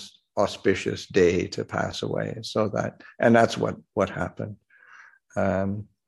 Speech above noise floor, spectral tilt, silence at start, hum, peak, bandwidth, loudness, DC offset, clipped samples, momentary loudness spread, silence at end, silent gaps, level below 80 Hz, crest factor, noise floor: 27 dB; -6 dB/octave; 0 s; none; -4 dBFS; 12 kHz; -25 LUFS; under 0.1%; under 0.1%; 12 LU; 0.25 s; none; -50 dBFS; 22 dB; -52 dBFS